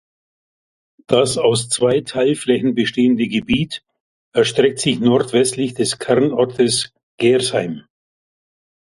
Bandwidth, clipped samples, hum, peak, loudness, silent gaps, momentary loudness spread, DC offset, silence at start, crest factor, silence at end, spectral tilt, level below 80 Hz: 11.5 kHz; under 0.1%; none; 0 dBFS; -17 LUFS; 4.00-4.32 s, 7.03-7.18 s; 6 LU; under 0.1%; 1.1 s; 18 dB; 1.1 s; -4.5 dB/octave; -52 dBFS